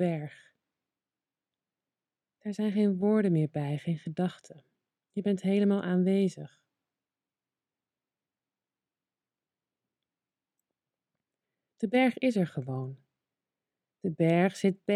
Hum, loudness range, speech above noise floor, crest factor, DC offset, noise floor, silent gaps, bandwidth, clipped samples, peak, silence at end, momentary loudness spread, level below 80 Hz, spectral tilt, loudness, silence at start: none; 5 LU; over 62 dB; 20 dB; under 0.1%; under -90 dBFS; none; 11.5 kHz; under 0.1%; -12 dBFS; 0 s; 13 LU; -80 dBFS; -8 dB/octave; -29 LUFS; 0 s